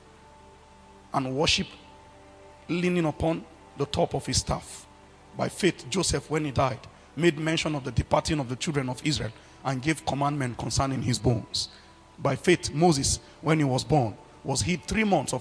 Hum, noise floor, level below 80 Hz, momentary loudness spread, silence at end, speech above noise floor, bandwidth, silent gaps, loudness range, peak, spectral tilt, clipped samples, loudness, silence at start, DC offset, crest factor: none; -52 dBFS; -46 dBFS; 10 LU; 0 s; 26 dB; 11 kHz; none; 4 LU; -8 dBFS; -4.5 dB/octave; under 0.1%; -27 LUFS; 0.95 s; under 0.1%; 20 dB